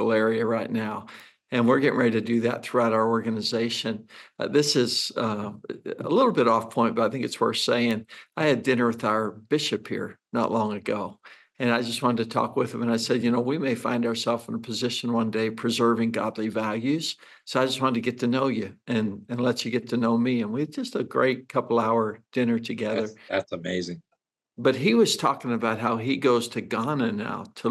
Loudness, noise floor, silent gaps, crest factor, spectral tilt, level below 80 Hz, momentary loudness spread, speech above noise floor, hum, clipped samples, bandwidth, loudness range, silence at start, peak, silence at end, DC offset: -25 LUFS; -77 dBFS; none; 16 dB; -5 dB/octave; -78 dBFS; 9 LU; 52 dB; none; under 0.1%; 12.5 kHz; 3 LU; 0 s; -8 dBFS; 0 s; under 0.1%